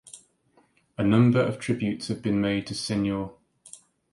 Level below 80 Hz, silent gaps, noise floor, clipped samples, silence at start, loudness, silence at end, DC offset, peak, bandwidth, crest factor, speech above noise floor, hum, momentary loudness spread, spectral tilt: -56 dBFS; none; -64 dBFS; under 0.1%; 0.15 s; -25 LUFS; 0.35 s; under 0.1%; -8 dBFS; 11.5 kHz; 18 dB; 40 dB; none; 14 LU; -6.5 dB/octave